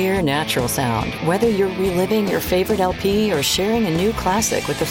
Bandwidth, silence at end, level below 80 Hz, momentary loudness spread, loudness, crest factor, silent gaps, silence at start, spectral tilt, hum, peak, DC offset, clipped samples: 17 kHz; 0 s; -38 dBFS; 3 LU; -19 LUFS; 14 dB; none; 0 s; -4.5 dB/octave; none; -4 dBFS; under 0.1%; under 0.1%